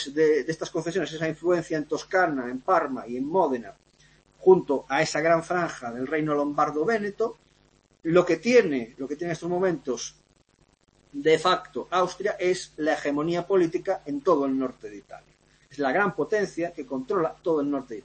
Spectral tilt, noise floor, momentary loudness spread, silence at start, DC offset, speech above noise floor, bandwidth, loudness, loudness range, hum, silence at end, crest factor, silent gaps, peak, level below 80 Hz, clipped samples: -5 dB/octave; -64 dBFS; 11 LU; 0 s; under 0.1%; 39 dB; 8.8 kHz; -25 LUFS; 3 LU; none; 0.05 s; 20 dB; none; -6 dBFS; -62 dBFS; under 0.1%